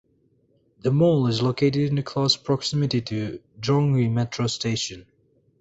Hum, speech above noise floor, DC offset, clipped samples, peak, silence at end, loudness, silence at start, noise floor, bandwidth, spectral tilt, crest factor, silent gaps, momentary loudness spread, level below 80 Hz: none; 41 dB; under 0.1%; under 0.1%; -6 dBFS; 0.6 s; -23 LUFS; 0.85 s; -64 dBFS; 8 kHz; -6 dB/octave; 16 dB; none; 10 LU; -56 dBFS